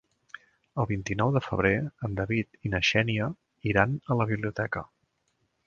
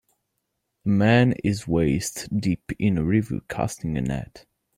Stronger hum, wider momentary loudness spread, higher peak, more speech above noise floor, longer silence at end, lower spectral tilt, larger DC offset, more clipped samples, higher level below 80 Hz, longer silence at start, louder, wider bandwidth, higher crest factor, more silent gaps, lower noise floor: neither; about the same, 12 LU vs 11 LU; about the same, -6 dBFS vs -8 dBFS; second, 47 dB vs 55 dB; first, 0.8 s vs 0.4 s; about the same, -6 dB/octave vs -6.5 dB/octave; neither; neither; about the same, -50 dBFS vs -46 dBFS; about the same, 0.75 s vs 0.85 s; second, -28 LUFS vs -24 LUFS; second, 7.2 kHz vs 16 kHz; first, 24 dB vs 16 dB; neither; second, -74 dBFS vs -78 dBFS